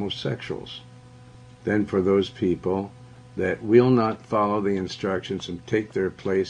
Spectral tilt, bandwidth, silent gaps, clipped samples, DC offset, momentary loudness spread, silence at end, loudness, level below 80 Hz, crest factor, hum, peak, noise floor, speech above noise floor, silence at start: -7 dB/octave; 9.4 kHz; none; under 0.1%; under 0.1%; 14 LU; 0 s; -24 LUFS; -58 dBFS; 20 dB; none; -4 dBFS; -47 dBFS; 23 dB; 0 s